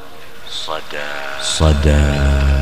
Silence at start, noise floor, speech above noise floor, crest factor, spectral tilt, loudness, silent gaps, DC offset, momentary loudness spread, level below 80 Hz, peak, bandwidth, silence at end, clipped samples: 0 s; -36 dBFS; 21 dB; 16 dB; -5 dB/octave; -17 LUFS; none; 5%; 14 LU; -18 dBFS; 0 dBFS; 12.5 kHz; 0 s; under 0.1%